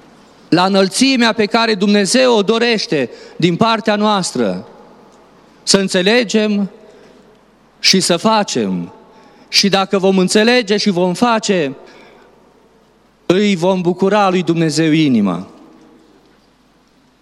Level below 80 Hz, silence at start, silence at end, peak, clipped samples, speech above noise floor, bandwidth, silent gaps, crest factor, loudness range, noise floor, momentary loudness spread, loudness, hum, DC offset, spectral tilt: -60 dBFS; 0.5 s; 1.75 s; 0 dBFS; under 0.1%; 39 dB; 16 kHz; none; 16 dB; 4 LU; -52 dBFS; 8 LU; -14 LUFS; none; under 0.1%; -4 dB/octave